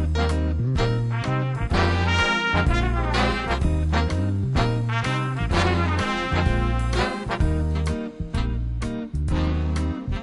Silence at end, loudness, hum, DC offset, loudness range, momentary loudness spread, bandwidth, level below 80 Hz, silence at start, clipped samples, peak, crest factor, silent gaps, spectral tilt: 0 s; -23 LUFS; none; under 0.1%; 3 LU; 7 LU; 11.5 kHz; -28 dBFS; 0 s; under 0.1%; -6 dBFS; 16 dB; none; -6 dB/octave